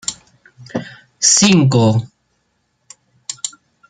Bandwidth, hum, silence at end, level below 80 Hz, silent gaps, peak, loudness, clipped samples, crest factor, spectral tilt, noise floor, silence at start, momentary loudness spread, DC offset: 10 kHz; none; 0.4 s; -56 dBFS; none; 0 dBFS; -13 LUFS; under 0.1%; 18 dB; -4 dB/octave; -66 dBFS; 0.1 s; 21 LU; under 0.1%